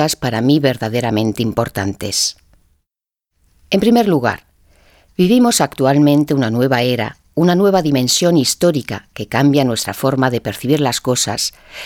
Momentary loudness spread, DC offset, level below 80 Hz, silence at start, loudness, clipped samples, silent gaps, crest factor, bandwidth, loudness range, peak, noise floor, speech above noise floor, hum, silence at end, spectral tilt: 9 LU; under 0.1%; -48 dBFS; 0 s; -15 LUFS; under 0.1%; none; 16 dB; 19 kHz; 5 LU; 0 dBFS; -82 dBFS; 67 dB; none; 0 s; -4.5 dB/octave